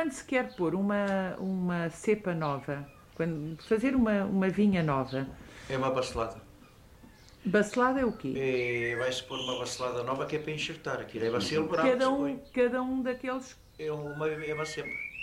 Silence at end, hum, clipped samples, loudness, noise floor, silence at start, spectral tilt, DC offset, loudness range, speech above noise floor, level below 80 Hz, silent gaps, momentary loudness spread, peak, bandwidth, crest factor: 0 s; none; under 0.1%; -31 LUFS; -55 dBFS; 0 s; -5.5 dB/octave; under 0.1%; 2 LU; 25 dB; -56 dBFS; none; 10 LU; -14 dBFS; 15.5 kHz; 18 dB